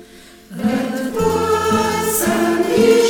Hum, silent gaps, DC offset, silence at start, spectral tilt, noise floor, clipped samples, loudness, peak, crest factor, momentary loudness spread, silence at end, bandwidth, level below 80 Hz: none; none; under 0.1%; 0 s; -4.5 dB/octave; -42 dBFS; under 0.1%; -17 LUFS; -2 dBFS; 14 dB; 7 LU; 0 s; 18 kHz; -44 dBFS